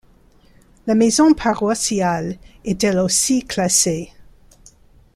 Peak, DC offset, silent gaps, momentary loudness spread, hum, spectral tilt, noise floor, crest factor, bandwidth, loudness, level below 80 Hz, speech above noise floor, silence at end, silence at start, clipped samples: -2 dBFS; under 0.1%; none; 15 LU; none; -3.5 dB/octave; -51 dBFS; 18 dB; 15 kHz; -17 LUFS; -46 dBFS; 34 dB; 0.9 s; 0.85 s; under 0.1%